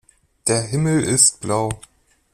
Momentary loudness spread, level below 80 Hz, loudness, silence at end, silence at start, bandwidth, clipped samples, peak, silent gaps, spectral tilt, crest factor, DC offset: 12 LU; -50 dBFS; -18 LUFS; 0.55 s; 0.45 s; 15.5 kHz; under 0.1%; 0 dBFS; none; -3.5 dB/octave; 20 dB; under 0.1%